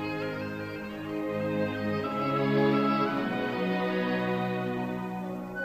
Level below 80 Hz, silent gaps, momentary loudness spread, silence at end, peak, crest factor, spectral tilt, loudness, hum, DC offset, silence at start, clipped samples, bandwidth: -60 dBFS; none; 10 LU; 0 s; -14 dBFS; 16 dB; -7.5 dB/octave; -30 LUFS; none; under 0.1%; 0 s; under 0.1%; 15.5 kHz